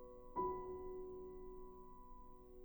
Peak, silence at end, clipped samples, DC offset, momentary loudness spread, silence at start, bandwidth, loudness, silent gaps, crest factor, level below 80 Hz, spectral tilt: -30 dBFS; 0 s; under 0.1%; under 0.1%; 17 LU; 0 s; over 20 kHz; -49 LUFS; none; 18 dB; -60 dBFS; -10 dB/octave